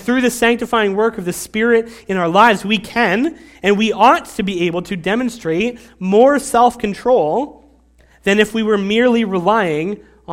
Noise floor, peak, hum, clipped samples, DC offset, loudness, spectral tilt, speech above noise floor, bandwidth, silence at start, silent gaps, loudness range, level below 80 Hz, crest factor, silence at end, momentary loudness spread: -50 dBFS; 0 dBFS; none; under 0.1%; under 0.1%; -15 LUFS; -5 dB/octave; 35 dB; 16.5 kHz; 0 s; none; 2 LU; -48 dBFS; 16 dB; 0 s; 10 LU